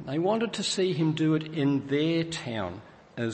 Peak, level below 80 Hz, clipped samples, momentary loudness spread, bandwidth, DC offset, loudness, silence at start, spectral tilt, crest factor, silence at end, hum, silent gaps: -14 dBFS; -64 dBFS; under 0.1%; 9 LU; 8.8 kHz; under 0.1%; -28 LUFS; 0 s; -5.5 dB/octave; 14 dB; 0 s; none; none